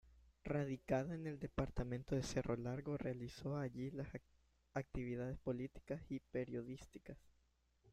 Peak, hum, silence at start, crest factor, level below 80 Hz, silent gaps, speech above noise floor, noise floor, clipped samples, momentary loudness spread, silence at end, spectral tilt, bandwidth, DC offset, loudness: -26 dBFS; none; 0.05 s; 20 dB; -60 dBFS; none; 34 dB; -78 dBFS; under 0.1%; 12 LU; 0.05 s; -7 dB/octave; 13 kHz; under 0.1%; -45 LUFS